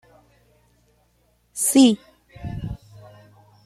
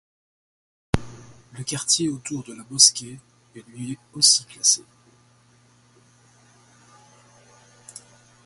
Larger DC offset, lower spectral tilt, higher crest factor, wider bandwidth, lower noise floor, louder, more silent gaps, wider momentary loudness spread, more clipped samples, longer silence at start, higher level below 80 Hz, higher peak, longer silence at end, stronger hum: neither; first, -4 dB/octave vs -1.5 dB/octave; about the same, 22 dB vs 26 dB; first, 15 kHz vs 12 kHz; first, -63 dBFS vs -57 dBFS; about the same, -19 LUFS vs -19 LUFS; neither; about the same, 23 LU vs 23 LU; neither; first, 1.55 s vs 0.95 s; about the same, -48 dBFS vs -50 dBFS; second, -4 dBFS vs 0 dBFS; second, 0.9 s vs 3.65 s; neither